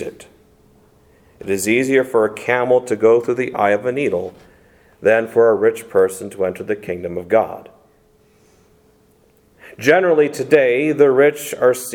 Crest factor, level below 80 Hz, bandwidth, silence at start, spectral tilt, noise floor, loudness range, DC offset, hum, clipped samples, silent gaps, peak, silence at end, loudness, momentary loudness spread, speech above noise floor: 18 dB; -60 dBFS; 17.5 kHz; 0 s; -5 dB/octave; -54 dBFS; 7 LU; under 0.1%; none; under 0.1%; none; 0 dBFS; 0 s; -17 LUFS; 11 LU; 38 dB